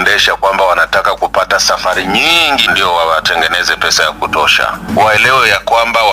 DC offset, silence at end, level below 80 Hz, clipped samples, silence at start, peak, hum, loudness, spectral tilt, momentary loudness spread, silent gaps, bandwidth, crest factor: under 0.1%; 0 s; -38 dBFS; 0.2%; 0 s; 0 dBFS; none; -9 LUFS; -1.5 dB/octave; 5 LU; none; 16.5 kHz; 10 dB